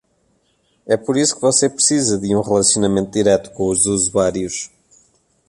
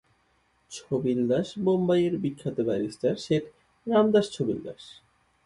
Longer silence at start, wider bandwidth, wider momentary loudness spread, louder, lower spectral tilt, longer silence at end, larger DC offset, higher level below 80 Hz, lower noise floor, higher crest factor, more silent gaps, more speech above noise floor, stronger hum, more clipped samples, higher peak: first, 0.85 s vs 0.7 s; about the same, 11.5 kHz vs 11.5 kHz; second, 7 LU vs 18 LU; first, -16 LUFS vs -26 LUFS; second, -3.5 dB/octave vs -7 dB/octave; first, 0.85 s vs 0.55 s; neither; first, -48 dBFS vs -64 dBFS; second, -62 dBFS vs -68 dBFS; about the same, 16 dB vs 18 dB; neither; first, 46 dB vs 42 dB; neither; neither; first, -2 dBFS vs -10 dBFS